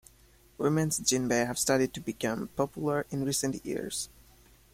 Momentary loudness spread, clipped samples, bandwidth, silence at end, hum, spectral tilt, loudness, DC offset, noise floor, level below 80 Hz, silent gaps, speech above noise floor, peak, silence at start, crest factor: 8 LU; under 0.1%; 16.5 kHz; 0.65 s; none; -4 dB/octave; -30 LUFS; under 0.1%; -60 dBFS; -58 dBFS; none; 30 dB; -10 dBFS; 0.6 s; 20 dB